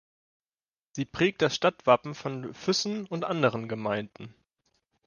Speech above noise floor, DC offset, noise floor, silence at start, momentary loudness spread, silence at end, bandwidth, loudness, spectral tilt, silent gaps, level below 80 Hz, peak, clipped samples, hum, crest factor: over 62 dB; under 0.1%; under -90 dBFS; 0.95 s; 14 LU; 0.75 s; 10 kHz; -28 LUFS; -4.5 dB/octave; none; -66 dBFS; -8 dBFS; under 0.1%; none; 22 dB